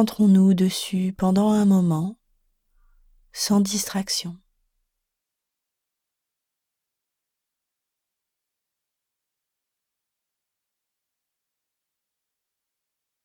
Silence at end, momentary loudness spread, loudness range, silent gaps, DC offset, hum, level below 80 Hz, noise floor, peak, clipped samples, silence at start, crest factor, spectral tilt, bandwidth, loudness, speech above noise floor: 8.9 s; 11 LU; 10 LU; none; under 0.1%; none; -60 dBFS; -85 dBFS; -6 dBFS; under 0.1%; 0 s; 20 dB; -5.5 dB/octave; 17 kHz; -21 LUFS; 65 dB